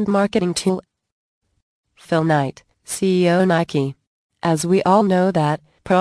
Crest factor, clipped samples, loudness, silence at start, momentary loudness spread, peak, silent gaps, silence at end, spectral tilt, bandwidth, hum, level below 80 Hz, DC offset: 16 dB; under 0.1%; -19 LUFS; 0 s; 11 LU; -2 dBFS; 1.12-1.42 s, 1.62-1.84 s, 4.07-4.30 s; 0 s; -6 dB/octave; 11 kHz; none; -56 dBFS; under 0.1%